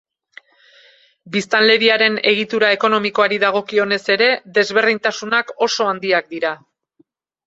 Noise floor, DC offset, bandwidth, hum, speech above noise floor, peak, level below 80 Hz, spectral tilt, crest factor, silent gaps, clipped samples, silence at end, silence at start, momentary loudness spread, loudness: -60 dBFS; under 0.1%; 8 kHz; none; 43 dB; 0 dBFS; -66 dBFS; -3 dB/octave; 18 dB; none; under 0.1%; 0.9 s; 1.25 s; 9 LU; -16 LUFS